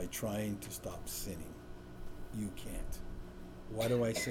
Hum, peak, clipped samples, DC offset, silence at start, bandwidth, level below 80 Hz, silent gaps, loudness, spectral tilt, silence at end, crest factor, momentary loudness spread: none; -22 dBFS; under 0.1%; under 0.1%; 0 s; over 20 kHz; -50 dBFS; none; -40 LUFS; -4.5 dB/octave; 0 s; 16 dB; 18 LU